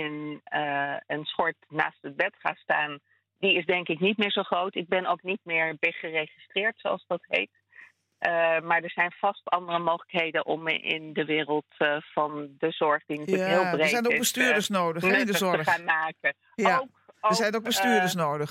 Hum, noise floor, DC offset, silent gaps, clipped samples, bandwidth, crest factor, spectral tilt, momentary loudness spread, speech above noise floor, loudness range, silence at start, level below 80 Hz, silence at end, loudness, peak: none; -54 dBFS; under 0.1%; none; under 0.1%; 16.5 kHz; 20 dB; -3.5 dB/octave; 7 LU; 27 dB; 4 LU; 0 s; -76 dBFS; 0 s; -26 LUFS; -8 dBFS